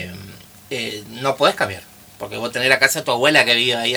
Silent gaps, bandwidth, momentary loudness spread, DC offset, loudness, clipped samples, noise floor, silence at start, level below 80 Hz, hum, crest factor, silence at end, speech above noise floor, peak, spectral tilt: none; over 20 kHz; 19 LU; under 0.1%; -17 LUFS; under 0.1%; -40 dBFS; 0 s; -58 dBFS; none; 20 dB; 0 s; 22 dB; 0 dBFS; -2.5 dB/octave